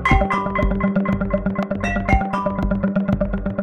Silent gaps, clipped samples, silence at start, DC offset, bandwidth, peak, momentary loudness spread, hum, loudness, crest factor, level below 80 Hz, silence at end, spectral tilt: none; under 0.1%; 0 s; 0.2%; 8.8 kHz; -2 dBFS; 4 LU; none; -21 LUFS; 16 dB; -26 dBFS; 0 s; -8 dB/octave